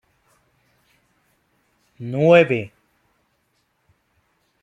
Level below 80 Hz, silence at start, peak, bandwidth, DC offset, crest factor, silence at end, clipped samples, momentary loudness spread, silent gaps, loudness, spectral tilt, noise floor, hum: -66 dBFS; 2 s; -2 dBFS; 7.8 kHz; under 0.1%; 22 dB; 1.95 s; under 0.1%; 23 LU; none; -17 LUFS; -7.5 dB/octave; -68 dBFS; none